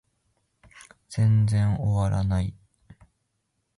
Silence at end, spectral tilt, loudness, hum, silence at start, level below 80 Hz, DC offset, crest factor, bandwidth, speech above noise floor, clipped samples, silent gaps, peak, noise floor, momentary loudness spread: 1.25 s; -8 dB/octave; -24 LUFS; none; 1.1 s; -42 dBFS; under 0.1%; 12 dB; 11.5 kHz; 54 dB; under 0.1%; none; -14 dBFS; -76 dBFS; 9 LU